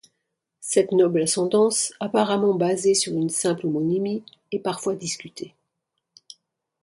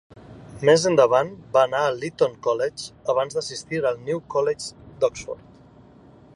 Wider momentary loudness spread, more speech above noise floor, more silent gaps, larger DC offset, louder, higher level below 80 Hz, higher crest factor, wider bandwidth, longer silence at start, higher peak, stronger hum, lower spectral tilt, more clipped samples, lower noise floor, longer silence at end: about the same, 13 LU vs 14 LU; first, 57 dB vs 28 dB; neither; neither; about the same, -22 LUFS vs -22 LUFS; second, -70 dBFS vs -58 dBFS; about the same, 18 dB vs 20 dB; about the same, 11.5 kHz vs 11.5 kHz; first, 0.6 s vs 0.15 s; about the same, -6 dBFS vs -4 dBFS; neither; about the same, -4 dB/octave vs -4.5 dB/octave; neither; first, -80 dBFS vs -49 dBFS; first, 1.35 s vs 1 s